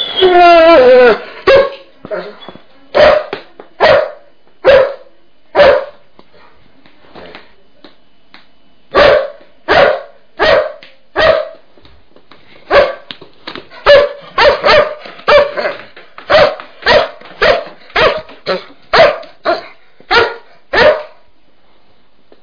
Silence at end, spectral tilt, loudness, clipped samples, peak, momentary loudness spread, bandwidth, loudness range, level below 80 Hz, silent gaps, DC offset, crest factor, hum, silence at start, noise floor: 1.35 s; -4.5 dB/octave; -10 LUFS; 0.3%; 0 dBFS; 18 LU; 5.4 kHz; 6 LU; -38 dBFS; none; 1%; 12 dB; none; 0 s; -53 dBFS